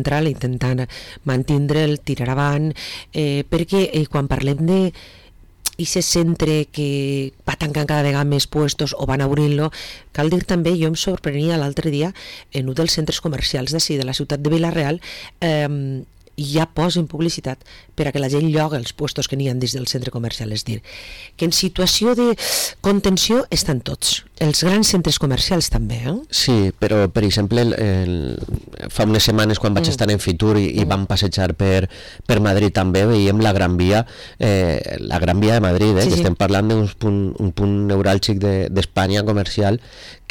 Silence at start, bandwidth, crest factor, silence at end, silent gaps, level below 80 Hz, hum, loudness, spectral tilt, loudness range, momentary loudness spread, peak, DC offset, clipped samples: 0 s; 19 kHz; 10 dB; 0.15 s; none; -36 dBFS; none; -19 LUFS; -5 dB/octave; 4 LU; 10 LU; -8 dBFS; 0.3%; under 0.1%